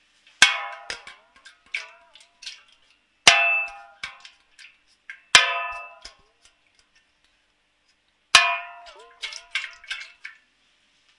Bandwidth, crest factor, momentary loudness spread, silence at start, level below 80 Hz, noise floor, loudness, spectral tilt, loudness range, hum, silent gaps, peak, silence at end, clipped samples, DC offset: 12 kHz; 26 dB; 25 LU; 0.4 s; -64 dBFS; -68 dBFS; -19 LUFS; 1.5 dB/octave; 4 LU; none; none; 0 dBFS; 0.9 s; under 0.1%; under 0.1%